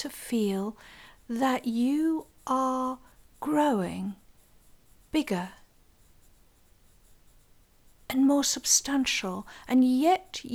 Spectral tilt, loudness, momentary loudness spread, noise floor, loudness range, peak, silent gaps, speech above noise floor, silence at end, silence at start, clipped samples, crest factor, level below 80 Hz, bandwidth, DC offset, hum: -3 dB/octave; -27 LUFS; 15 LU; -60 dBFS; 12 LU; -10 dBFS; none; 33 dB; 0 s; 0 s; under 0.1%; 20 dB; -60 dBFS; 17 kHz; under 0.1%; none